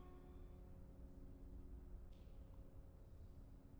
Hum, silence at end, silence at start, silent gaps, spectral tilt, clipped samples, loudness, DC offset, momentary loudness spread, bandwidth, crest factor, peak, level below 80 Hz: none; 0 s; 0 s; none; -8 dB/octave; under 0.1%; -62 LUFS; under 0.1%; 3 LU; over 20 kHz; 12 dB; -46 dBFS; -60 dBFS